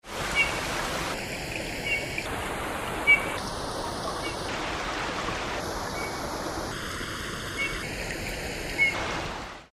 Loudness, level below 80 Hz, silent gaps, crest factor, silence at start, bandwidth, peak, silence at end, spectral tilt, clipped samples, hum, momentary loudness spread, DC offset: -29 LUFS; -44 dBFS; none; 22 dB; 0.05 s; 15.5 kHz; -10 dBFS; 0.05 s; -3 dB/octave; under 0.1%; none; 9 LU; under 0.1%